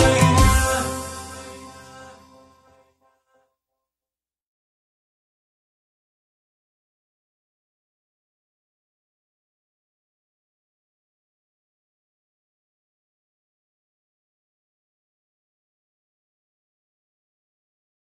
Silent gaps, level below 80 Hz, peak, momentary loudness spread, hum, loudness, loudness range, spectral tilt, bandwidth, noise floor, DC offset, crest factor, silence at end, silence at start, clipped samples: none; -36 dBFS; -2 dBFS; 26 LU; none; -19 LUFS; 25 LU; -4.5 dB/octave; 14.5 kHz; under -90 dBFS; under 0.1%; 26 dB; 16 s; 0 s; under 0.1%